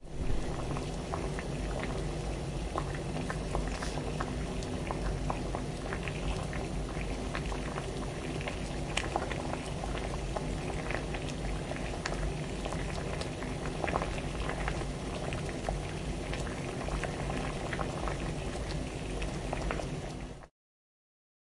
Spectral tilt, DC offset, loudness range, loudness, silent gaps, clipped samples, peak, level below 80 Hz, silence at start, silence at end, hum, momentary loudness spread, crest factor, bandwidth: -5.5 dB/octave; under 0.1%; 1 LU; -36 LUFS; none; under 0.1%; -10 dBFS; -40 dBFS; 0 s; 1 s; none; 2 LU; 26 dB; 11.5 kHz